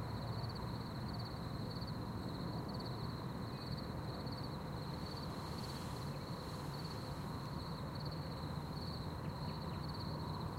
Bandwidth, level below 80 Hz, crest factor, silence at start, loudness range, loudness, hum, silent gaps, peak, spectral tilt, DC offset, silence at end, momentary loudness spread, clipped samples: 16 kHz; -56 dBFS; 14 dB; 0 s; 1 LU; -45 LUFS; none; none; -30 dBFS; -6.5 dB/octave; under 0.1%; 0 s; 2 LU; under 0.1%